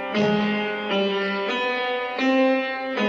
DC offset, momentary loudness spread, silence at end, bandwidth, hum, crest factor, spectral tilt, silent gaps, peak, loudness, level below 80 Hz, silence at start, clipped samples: under 0.1%; 5 LU; 0 s; 7.6 kHz; none; 14 dB; -6 dB/octave; none; -10 dBFS; -23 LUFS; -64 dBFS; 0 s; under 0.1%